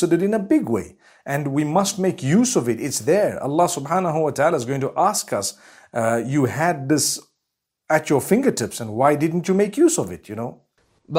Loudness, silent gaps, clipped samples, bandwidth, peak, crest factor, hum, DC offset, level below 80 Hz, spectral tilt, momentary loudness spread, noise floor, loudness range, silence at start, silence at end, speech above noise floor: -20 LUFS; none; under 0.1%; 16 kHz; -4 dBFS; 18 dB; none; under 0.1%; -62 dBFS; -5 dB/octave; 9 LU; -80 dBFS; 2 LU; 0 s; 0 s; 60 dB